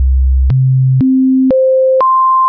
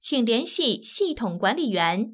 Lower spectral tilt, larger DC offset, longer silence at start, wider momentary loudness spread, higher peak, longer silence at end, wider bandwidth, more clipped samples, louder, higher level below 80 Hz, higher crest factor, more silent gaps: first, -13.5 dB/octave vs -9 dB/octave; neither; about the same, 0 s vs 0.05 s; about the same, 3 LU vs 4 LU; first, -6 dBFS vs -10 dBFS; about the same, 0 s vs 0 s; second, 3 kHz vs 4 kHz; neither; first, -10 LUFS vs -24 LUFS; first, -16 dBFS vs -58 dBFS; second, 4 dB vs 16 dB; neither